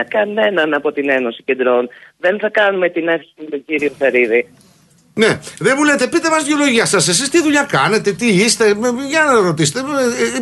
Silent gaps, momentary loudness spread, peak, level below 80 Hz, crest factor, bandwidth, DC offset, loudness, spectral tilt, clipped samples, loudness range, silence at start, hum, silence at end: none; 7 LU; -2 dBFS; -58 dBFS; 14 dB; 12.5 kHz; under 0.1%; -14 LUFS; -3.5 dB/octave; under 0.1%; 4 LU; 0 s; none; 0 s